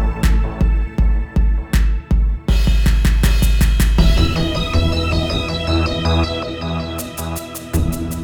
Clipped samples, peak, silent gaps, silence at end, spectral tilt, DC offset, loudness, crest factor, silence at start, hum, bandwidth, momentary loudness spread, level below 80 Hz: under 0.1%; -2 dBFS; none; 0 s; -5.5 dB/octave; under 0.1%; -18 LUFS; 14 dB; 0 s; none; 18 kHz; 8 LU; -16 dBFS